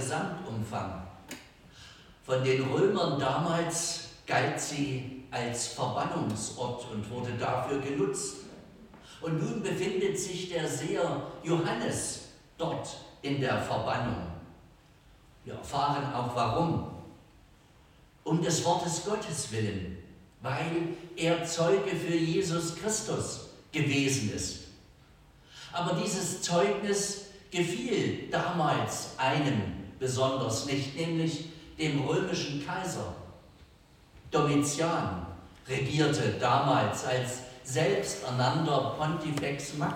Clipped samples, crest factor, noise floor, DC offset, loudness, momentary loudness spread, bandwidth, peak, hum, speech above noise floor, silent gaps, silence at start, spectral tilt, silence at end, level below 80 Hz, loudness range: under 0.1%; 18 dB; -58 dBFS; under 0.1%; -31 LUFS; 14 LU; 16.5 kHz; -12 dBFS; none; 28 dB; none; 0 s; -4.5 dB/octave; 0 s; -58 dBFS; 4 LU